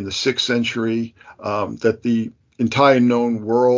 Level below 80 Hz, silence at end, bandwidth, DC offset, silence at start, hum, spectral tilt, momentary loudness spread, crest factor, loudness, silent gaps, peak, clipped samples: -54 dBFS; 0 s; 7.6 kHz; under 0.1%; 0 s; none; -5 dB/octave; 11 LU; 18 dB; -19 LUFS; none; -2 dBFS; under 0.1%